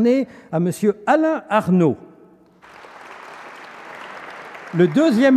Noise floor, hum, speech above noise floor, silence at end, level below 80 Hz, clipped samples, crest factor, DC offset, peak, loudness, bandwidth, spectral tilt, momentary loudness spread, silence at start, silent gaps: -50 dBFS; none; 33 dB; 0 s; -64 dBFS; under 0.1%; 16 dB; under 0.1%; -4 dBFS; -18 LUFS; 14 kHz; -7 dB/octave; 22 LU; 0 s; none